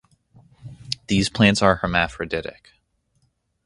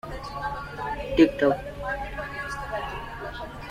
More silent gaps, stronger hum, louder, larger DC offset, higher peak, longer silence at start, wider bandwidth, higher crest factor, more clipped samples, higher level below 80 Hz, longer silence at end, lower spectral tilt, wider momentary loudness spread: neither; neither; first, -20 LUFS vs -28 LUFS; neither; first, 0 dBFS vs -4 dBFS; first, 0.65 s vs 0.05 s; second, 11.5 kHz vs 14.5 kHz; about the same, 24 dB vs 24 dB; neither; about the same, -44 dBFS vs -42 dBFS; first, 1.15 s vs 0 s; second, -5 dB/octave vs -6.5 dB/octave; about the same, 15 LU vs 15 LU